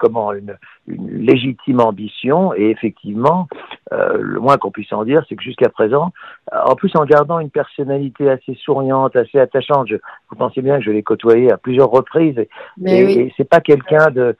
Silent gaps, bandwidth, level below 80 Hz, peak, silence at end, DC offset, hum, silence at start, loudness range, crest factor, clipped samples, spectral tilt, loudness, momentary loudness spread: none; 7.4 kHz; -58 dBFS; 0 dBFS; 0.05 s; under 0.1%; none; 0 s; 3 LU; 14 dB; under 0.1%; -8.5 dB/octave; -15 LUFS; 12 LU